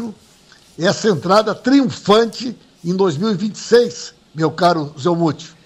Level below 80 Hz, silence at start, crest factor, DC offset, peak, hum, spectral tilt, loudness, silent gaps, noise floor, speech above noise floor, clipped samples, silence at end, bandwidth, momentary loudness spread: -56 dBFS; 0 s; 16 dB; under 0.1%; -2 dBFS; none; -5.5 dB/octave; -17 LUFS; none; -48 dBFS; 32 dB; under 0.1%; 0.15 s; 12.5 kHz; 13 LU